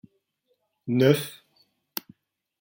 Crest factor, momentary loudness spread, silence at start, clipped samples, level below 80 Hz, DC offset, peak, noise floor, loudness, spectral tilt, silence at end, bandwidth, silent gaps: 24 dB; 17 LU; 0.85 s; under 0.1%; -70 dBFS; under 0.1%; -6 dBFS; -74 dBFS; -25 LUFS; -6 dB/octave; 1.3 s; 17 kHz; none